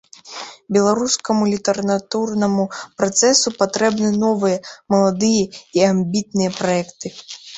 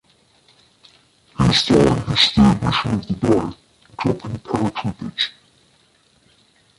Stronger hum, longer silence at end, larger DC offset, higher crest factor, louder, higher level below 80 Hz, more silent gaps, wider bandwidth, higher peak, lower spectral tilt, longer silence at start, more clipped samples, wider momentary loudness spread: neither; second, 0 s vs 1.5 s; neither; about the same, 18 dB vs 18 dB; about the same, -18 LUFS vs -18 LUFS; second, -58 dBFS vs -40 dBFS; neither; second, 8.4 kHz vs 11.5 kHz; about the same, 0 dBFS vs -2 dBFS; second, -4 dB/octave vs -5.5 dB/octave; second, 0.25 s vs 1.4 s; neither; about the same, 14 LU vs 13 LU